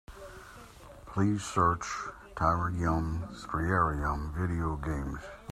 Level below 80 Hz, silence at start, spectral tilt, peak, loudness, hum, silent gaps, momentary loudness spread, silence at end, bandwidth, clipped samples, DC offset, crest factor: -44 dBFS; 0.1 s; -6.5 dB/octave; -12 dBFS; -31 LUFS; none; none; 20 LU; 0 s; 13.5 kHz; under 0.1%; under 0.1%; 20 dB